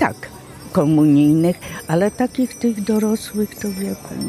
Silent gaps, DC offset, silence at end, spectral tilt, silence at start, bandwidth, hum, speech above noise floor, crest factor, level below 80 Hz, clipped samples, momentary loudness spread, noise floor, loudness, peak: none; under 0.1%; 0 s; -6.5 dB/octave; 0 s; 15 kHz; none; 19 dB; 16 dB; -50 dBFS; under 0.1%; 13 LU; -36 dBFS; -18 LUFS; -2 dBFS